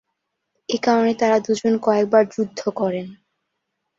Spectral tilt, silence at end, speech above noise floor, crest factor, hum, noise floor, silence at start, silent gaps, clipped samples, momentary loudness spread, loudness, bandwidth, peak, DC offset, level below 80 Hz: -5.5 dB/octave; 0.85 s; 58 dB; 18 dB; none; -77 dBFS; 0.7 s; none; under 0.1%; 11 LU; -20 LUFS; 7.8 kHz; -2 dBFS; under 0.1%; -66 dBFS